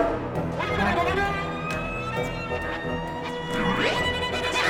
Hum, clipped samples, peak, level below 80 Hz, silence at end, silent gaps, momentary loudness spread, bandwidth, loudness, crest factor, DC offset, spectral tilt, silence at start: none; under 0.1%; -8 dBFS; -42 dBFS; 0 s; none; 7 LU; 17.5 kHz; -26 LUFS; 18 dB; under 0.1%; -5 dB/octave; 0 s